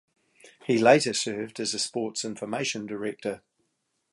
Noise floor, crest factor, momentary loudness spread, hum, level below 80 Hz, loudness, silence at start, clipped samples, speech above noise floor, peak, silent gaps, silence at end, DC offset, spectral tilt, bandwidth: -76 dBFS; 24 dB; 15 LU; none; -74 dBFS; -26 LUFS; 0.45 s; under 0.1%; 50 dB; -4 dBFS; none; 0.75 s; under 0.1%; -3.5 dB/octave; 11.5 kHz